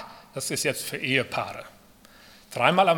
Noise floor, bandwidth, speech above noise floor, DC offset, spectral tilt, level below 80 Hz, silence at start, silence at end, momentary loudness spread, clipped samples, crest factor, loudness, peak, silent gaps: -53 dBFS; 18 kHz; 28 dB; under 0.1%; -3.5 dB/octave; -64 dBFS; 0 s; 0 s; 16 LU; under 0.1%; 24 dB; -26 LUFS; -4 dBFS; none